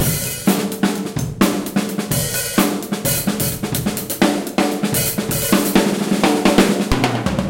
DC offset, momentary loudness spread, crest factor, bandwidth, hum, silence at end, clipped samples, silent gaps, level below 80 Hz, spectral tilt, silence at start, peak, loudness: under 0.1%; 6 LU; 18 dB; 17 kHz; none; 0 s; under 0.1%; none; -36 dBFS; -4.5 dB/octave; 0 s; 0 dBFS; -18 LUFS